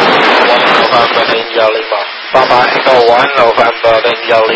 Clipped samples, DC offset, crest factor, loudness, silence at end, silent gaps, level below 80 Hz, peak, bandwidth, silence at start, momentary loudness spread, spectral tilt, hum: 2%; under 0.1%; 8 dB; -8 LUFS; 0 s; none; -48 dBFS; 0 dBFS; 8 kHz; 0 s; 4 LU; -4 dB/octave; none